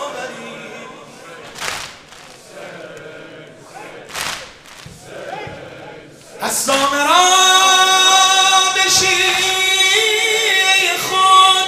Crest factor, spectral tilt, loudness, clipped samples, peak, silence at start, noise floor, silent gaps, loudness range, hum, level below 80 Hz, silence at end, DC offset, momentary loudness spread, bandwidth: 16 dB; 0.5 dB/octave; -11 LUFS; under 0.1%; 0 dBFS; 0 s; -39 dBFS; none; 20 LU; none; -56 dBFS; 0 s; under 0.1%; 24 LU; 16 kHz